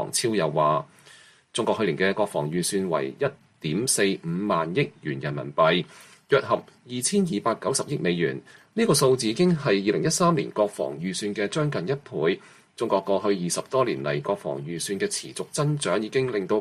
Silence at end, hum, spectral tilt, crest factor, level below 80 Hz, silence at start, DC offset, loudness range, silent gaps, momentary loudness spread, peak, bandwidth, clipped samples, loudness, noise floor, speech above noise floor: 0 s; none; -4.5 dB/octave; 18 dB; -64 dBFS; 0 s; under 0.1%; 3 LU; none; 8 LU; -8 dBFS; 14 kHz; under 0.1%; -25 LUFS; -53 dBFS; 28 dB